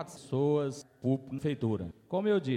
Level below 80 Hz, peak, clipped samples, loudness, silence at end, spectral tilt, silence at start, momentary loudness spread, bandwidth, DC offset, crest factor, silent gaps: -64 dBFS; -18 dBFS; under 0.1%; -32 LUFS; 0 s; -7.5 dB/octave; 0 s; 7 LU; 12.5 kHz; under 0.1%; 14 dB; none